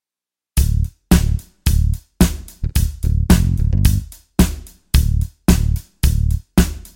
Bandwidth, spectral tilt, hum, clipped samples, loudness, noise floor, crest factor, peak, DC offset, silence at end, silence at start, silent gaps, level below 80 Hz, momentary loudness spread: 17 kHz; -5.5 dB/octave; none; under 0.1%; -18 LUFS; -89 dBFS; 16 dB; 0 dBFS; under 0.1%; 0.1 s; 0.55 s; none; -20 dBFS; 7 LU